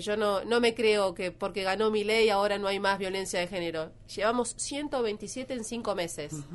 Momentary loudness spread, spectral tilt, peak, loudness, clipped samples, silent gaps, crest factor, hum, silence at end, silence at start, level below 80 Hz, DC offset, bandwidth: 10 LU; -3.5 dB/octave; -12 dBFS; -29 LUFS; under 0.1%; none; 16 dB; none; 0 s; 0 s; -56 dBFS; under 0.1%; 11.5 kHz